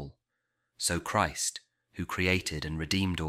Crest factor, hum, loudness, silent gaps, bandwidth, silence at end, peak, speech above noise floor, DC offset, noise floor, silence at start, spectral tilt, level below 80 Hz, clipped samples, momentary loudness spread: 20 dB; none; -30 LUFS; none; 16.5 kHz; 0 s; -12 dBFS; 52 dB; under 0.1%; -82 dBFS; 0 s; -3.5 dB/octave; -50 dBFS; under 0.1%; 16 LU